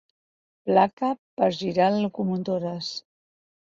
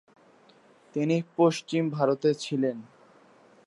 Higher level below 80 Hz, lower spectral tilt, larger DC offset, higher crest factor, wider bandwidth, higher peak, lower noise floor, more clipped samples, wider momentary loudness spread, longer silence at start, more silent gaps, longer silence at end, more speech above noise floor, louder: first, -68 dBFS vs -82 dBFS; about the same, -6.5 dB/octave vs -6.5 dB/octave; neither; about the same, 20 dB vs 18 dB; second, 7.6 kHz vs 11.5 kHz; first, -6 dBFS vs -10 dBFS; first, under -90 dBFS vs -58 dBFS; neither; first, 11 LU vs 7 LU; second, 0.65 s vs 0.95 s; first, 0.93-0.97 s, 1.18-1.37 s vs none; about the same, 0.75 s vs 0.8 s; first, over 66 dB vs 32 dB; about the same, -25 LUFS vs -27 LUFS